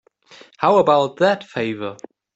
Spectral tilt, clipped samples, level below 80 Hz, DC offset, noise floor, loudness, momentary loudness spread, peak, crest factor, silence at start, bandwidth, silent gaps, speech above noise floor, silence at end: -6 dB/octave; under 0.1%; -64 dBFS; under 0.1%; -48 dBFS; -18 LUFS; 13 LU; -4 dBFS; 16 dB; 0.6 s; 8 kHz; none; 30 dB; 0.4 s